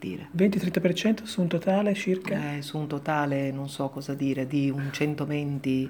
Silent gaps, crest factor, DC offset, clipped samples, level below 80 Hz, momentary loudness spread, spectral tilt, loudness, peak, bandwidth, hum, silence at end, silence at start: none; 18 dB; under 0.1%; under 0.1%; -68 dBFS; 7 LU; -6.5 dB/octave; -27 LUFS; -10 dBFS; over 20 kHz; none; 0 s; 0 s